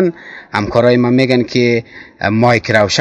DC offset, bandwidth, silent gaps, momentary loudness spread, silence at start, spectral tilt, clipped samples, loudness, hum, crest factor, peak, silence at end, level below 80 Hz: under 0.1%; 11 kHz; none; 9 LU; 0 s; -5.5 dB/octave; 0.4%; -13 LUFS; none; 12 dB; 0 dBFS; 0 s; -44 dBFS